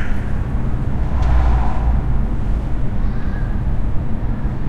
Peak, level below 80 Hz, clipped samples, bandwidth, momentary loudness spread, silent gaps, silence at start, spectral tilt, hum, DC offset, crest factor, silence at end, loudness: -4 dBFS; -18 dBFS; under 0.1%; 5 kHz; 6 LU; none; 0 s; -9 dB/octave; none; under 0.1%; 12 dB; 0 s; -21 LUFS